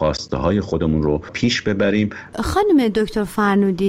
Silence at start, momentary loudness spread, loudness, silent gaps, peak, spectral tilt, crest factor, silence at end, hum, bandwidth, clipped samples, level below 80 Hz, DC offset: 0 s; 6 LU; -19 LUFS; none; -6 dBFS; -6 dB/octave; 12 dB; 0 s; none; 15.5 kHz; under 0.1%; -36 dBFS; under 0.1%